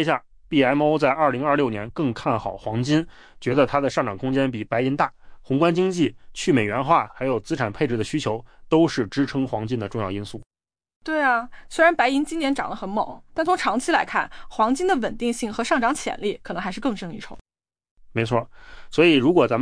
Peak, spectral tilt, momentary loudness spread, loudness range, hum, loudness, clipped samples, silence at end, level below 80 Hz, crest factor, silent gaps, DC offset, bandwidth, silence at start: -6 dBFS; -5.5 dB/octave; 10 LU; 3 LU; none; -23 LUFS; under 0.1%; 0 s; -48 dBFS; 18 dB; 10.46-10.50 s, 10.96-11.01 s, 17.41-17.45 s, 17.91-17.96 s; under 0.1%; 10.5 kHz; 0 s